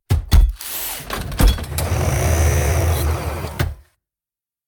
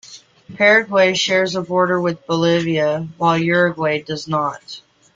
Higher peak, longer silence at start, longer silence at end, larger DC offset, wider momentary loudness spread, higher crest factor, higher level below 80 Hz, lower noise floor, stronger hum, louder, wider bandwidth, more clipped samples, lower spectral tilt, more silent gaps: about the same, -2 dBFS vs -2 dBFS; about the same, 0.1 s vs 0.05 s; first, 0.85 s vs 0.35 s; neither; about the same, 9 LU vs 10 LU; about the same, 16 dB vs 16 dB; first, -20 dBFS vs -60 dBFS; first, under -90 dBFS vs -41 dBFS; neither; second, -20 LUFS vs -17 LUFS; first, over 20 kHz vs 7.6 kHz; neither; about the same, -5 dB/octave vs -5 dB/octave; neither